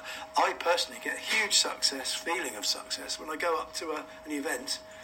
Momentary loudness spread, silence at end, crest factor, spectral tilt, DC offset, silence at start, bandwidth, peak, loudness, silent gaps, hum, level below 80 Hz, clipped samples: 11 LU; 0 s; 20 dB; 0.5 dB/octave; under 0.1%; 0 s; 16.5 kHz; -12 dBFS; -30 LUFS; none; none; -66 dBFS; under 0.1%